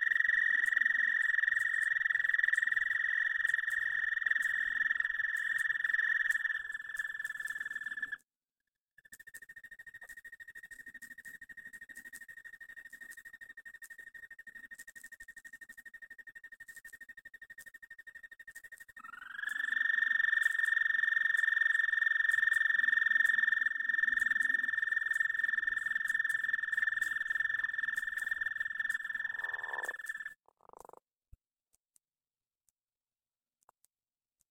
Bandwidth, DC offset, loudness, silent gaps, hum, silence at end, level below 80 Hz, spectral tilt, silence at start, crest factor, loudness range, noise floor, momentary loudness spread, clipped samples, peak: 17.5 kHz; under 0.1%; -31 LUFS; 8.80-8.84 s; none; 4.15 s; -76 dBFS; 1 dB/octave; 0 s; 18 dB; 22 LU; under -90 dBFS; 22 LU; under 0.1%; -16 dBFS